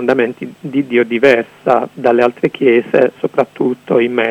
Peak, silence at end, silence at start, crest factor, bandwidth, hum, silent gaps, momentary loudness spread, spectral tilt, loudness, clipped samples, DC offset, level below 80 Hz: 0 dBFS; 0 s; 0 s; 14 dB; 8.8 kHz; none; none; 7 LU; -7 dB/octave; -14 LUFS; 0.4%; under 0.1%; -60 dBFS